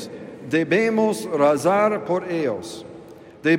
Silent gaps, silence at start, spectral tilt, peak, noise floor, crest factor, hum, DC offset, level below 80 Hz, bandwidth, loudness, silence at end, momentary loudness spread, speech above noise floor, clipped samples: none; 0 s; -5.5 dB/octave; -6 dBFS; -42 dBFS; 16 dB; none; under 0.1%; -68 dBFS; 16 kHz; -21 LUFS; 0 s; 18 LU; 22 dB; under 0.1%